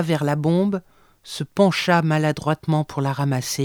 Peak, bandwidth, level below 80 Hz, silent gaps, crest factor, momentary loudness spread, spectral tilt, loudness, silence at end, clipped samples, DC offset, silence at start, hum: -4 dBFS; 19 kHz; -58 dBFS; none; 16 dB; 10 LU; -6 dB/octave; -21 LUFS; 0 s; under 0.1%; under 0.1%; 0 s; none